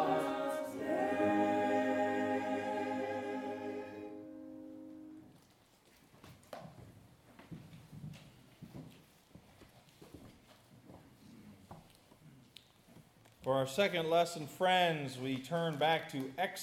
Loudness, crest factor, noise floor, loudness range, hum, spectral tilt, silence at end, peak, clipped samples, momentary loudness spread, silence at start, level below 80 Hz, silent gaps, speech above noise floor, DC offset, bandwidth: -35 LUFS; 20 dB; -66 dBFS; 24 LU; none; -5 dB/octave; 0 s; -18 dBFS; under 0.1%; 25 LU; 0 s; -76 dBFS; none; 32 dB; under 0.1%; 16.5 kHz